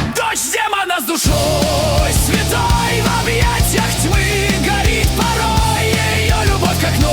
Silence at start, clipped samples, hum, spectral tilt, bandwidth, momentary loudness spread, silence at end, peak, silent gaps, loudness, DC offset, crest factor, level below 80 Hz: 0 s; under 0.1%; none; -4 dB/octave; over 20 kHz; 2 LU; 0 s; -2 dBFS; none; -15 LUFS; under 0.1%; 12 dB; -22 dBFS